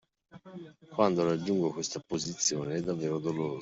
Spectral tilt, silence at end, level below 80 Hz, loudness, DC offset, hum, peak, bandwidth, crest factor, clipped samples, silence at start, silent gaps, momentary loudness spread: -4.5 dB/octave; 0 s; -68 dBFS; -31 LUFS; under 0.1%; none; -10 dBFS; 8 kHz; 22 dB; under 0.1%; 0.35 s; none; 20 LU